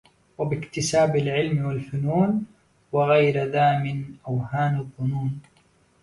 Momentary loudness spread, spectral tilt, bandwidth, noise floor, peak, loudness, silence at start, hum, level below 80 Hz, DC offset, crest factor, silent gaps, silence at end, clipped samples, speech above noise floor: 10 LU; -6 dB/octave; 11.5 kHz; -61 dBFS; -6 dBFS; -24 LUFS; 0.4 s; none; -56 dBFS; under 0.1%; 16 dB; none; 0.6 s; under 0.1%; 38 dB